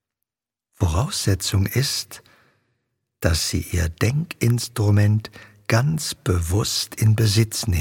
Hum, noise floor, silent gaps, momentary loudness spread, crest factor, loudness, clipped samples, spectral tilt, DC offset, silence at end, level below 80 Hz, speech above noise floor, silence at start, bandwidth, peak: none; -87 dBFS; none; 7 LU; 20 dB; -21 LUFS; under 0.1%; -4.5 dB/octave; under 0.1%; 0 s; -36 dBFS; 67 dB; 0.8 s; 17 kHz; -2 dBFS